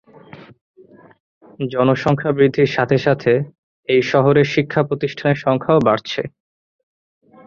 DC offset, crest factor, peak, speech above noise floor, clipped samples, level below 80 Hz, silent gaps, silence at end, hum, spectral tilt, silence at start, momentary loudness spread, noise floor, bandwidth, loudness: under 0.1%; 16 dB; -2 dBFS; 25 dB; under 0.1%; -54 dBFS; 0.61-0.74 s, 1.20-1.41 s, 3.58-3.83 s; 1.2 s; none; -7.5 dB/octave; 0.35 s; 11 LU; -41 dBFS; 7.2 kHz; -17 LUFS